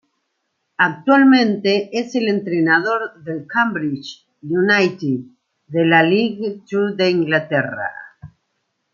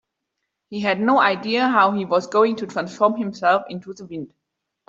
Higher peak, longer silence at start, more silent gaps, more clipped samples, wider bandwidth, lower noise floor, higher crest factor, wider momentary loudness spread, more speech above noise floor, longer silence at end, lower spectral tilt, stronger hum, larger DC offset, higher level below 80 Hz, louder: about the same, -2 dBFS vs -2 dBFS; about the same, 0.8 s vs 0.7 s; neither; neither; about the same, 7.2 kHz vs 7.8 kHz; second, -72 dBFS vs -79 dBFS; about the same, 16 dB vs 18 dB; second, 14 LU vs 17 LU; second, 55 dB vs 59 dB; about the same, 0.65 s vs 0.6 s; about the same, -6 dB/octave vs -5.5 dB/octave; neither; neither; about the same, -66 dBFS vs -68 dBFS; about the same, -17 LUFS vs -19 LUFS